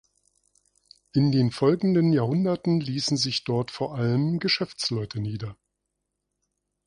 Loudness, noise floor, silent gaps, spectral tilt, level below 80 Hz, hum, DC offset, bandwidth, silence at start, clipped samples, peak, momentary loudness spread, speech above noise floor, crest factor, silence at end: -25 LUFS; -81 dBFS; none; -6 dB/octave; -60 dBFS; 50 Hz at -50 dBFS; under 0.1%; 11 kHz; 1.15 s; under 0.1%; -8 dBFS; 9 LU; 57 dB; 16 dB; 1.35 s